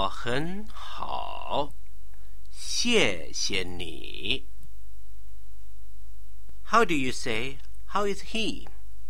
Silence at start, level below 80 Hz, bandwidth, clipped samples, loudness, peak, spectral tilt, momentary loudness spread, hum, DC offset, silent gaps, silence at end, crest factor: 0 s; -46 dBFS; 16.5 kHz; under 0.1%; -29 LUFS; -8 dBFS; -3 dB/octave; 17 LU; none; 7%; none; 0 s; 24 dB